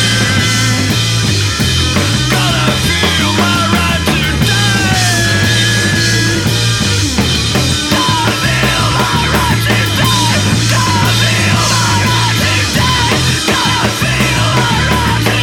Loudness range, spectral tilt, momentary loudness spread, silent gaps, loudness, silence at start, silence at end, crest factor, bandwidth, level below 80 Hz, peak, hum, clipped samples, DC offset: 1 LU; -3.5 dB/octave; 2 LU; none; -11 LUFS; 0 s; 0 s; 10 dB; 17.5 kHz; -26 dBFS; 0 dBFS; none; under 0.1%; under 0.1%